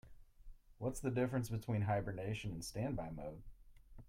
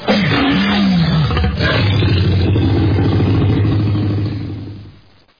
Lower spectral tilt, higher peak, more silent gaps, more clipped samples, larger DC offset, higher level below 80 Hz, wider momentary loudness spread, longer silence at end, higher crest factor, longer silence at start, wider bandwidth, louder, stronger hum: second, -6.5 dB/octave vs -8 dB/octave; second, -24 dBFS vs -4 dBFS; neither; neither; neither; second, -58 dBFS vs -28 dBFS; first, 10 LU vs 7 LU; second, 0.05 s vs 0.5 s; first, 18 dB vs 10 dB; about the same, 0.05 s vs 0 s; first, 16 kHz vs 5.2 kHz; second, -41 LUFS vs -14 LUFS; neither